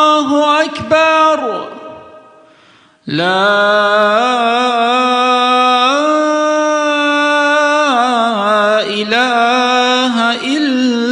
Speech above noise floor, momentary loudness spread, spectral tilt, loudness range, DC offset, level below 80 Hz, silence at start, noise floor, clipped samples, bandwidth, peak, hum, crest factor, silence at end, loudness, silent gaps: 36 dB; 4 LU; -3.5 dB/octave; 3 LU; under 0.1%; -62 dBFS; 0 s; -47 dBFS; under 0.1%; 10.5 kHz; 0 dBFS; none; 12 dB; 0 s; -12 LUFS; none